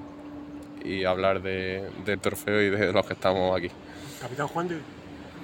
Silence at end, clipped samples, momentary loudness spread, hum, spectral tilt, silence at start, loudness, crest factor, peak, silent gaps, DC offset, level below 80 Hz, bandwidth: 0 s; under 0.1%; 17 LU; none; -5.5 dB/octave; 0 s; -28 LUFS; 22 dB; -8 dBFS; none; under 0.1%; -58 dBFS; 17 kHz